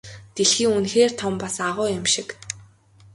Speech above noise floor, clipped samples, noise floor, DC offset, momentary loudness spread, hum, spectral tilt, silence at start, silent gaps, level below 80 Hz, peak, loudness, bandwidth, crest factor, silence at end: 30 dB; under 0.1%; -52 dBFS; under 0.1%; 16 LU; none; -2.5 dB/octave; 0.05 s; none; -56 dBFS; -4 dBFS; -21 LUFS; 11.5 kHz; 18 dB; 0.5 s